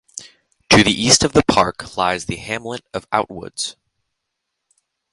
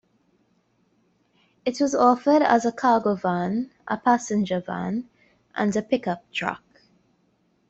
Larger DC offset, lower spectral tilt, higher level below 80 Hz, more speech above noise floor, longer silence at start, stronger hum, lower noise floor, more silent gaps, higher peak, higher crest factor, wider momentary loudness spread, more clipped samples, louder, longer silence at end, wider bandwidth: neither; second, -3 dB/octave vs -5.5 dB/octave; first, -44 dBFS vs -66 dBFS; first, 59 dB vs 44 dB; second, 0.15 s vs 1.65 s; neither; first, -78 dBFS vs -66 dBFS; neither; first, 0 dBFS vs -4 dBFS; about the same, 20 dB vs 20 dB; first, 16 LU vs 12 LU; neither; first, -17 LUFS vs -23 LUFS; first, 1.4 s vs 1.1 s; first, 16 kHz vs 8.2 kHz